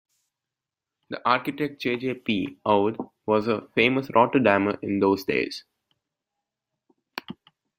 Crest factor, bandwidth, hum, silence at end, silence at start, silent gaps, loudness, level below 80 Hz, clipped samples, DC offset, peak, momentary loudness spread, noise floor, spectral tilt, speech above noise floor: 22 dB; 16 kHz; none; 0.45 s; 1.1 s; none; -24 LUFS; -66 dBFS; under 0.1%; under 0.1%; -4 dBFS; 18 LU; -88 dBFS; -6.5 dB/octave; 64 dB